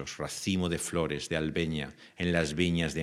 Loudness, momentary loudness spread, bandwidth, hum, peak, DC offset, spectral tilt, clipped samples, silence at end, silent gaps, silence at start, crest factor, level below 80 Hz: -31 LUFS; 7 LU; 15 kHz; none; -12 dBFS; under 0.1%; -5 dB/octave; under 0.1%; 0 s; none; 0 s; 20 dB; -54 dBFS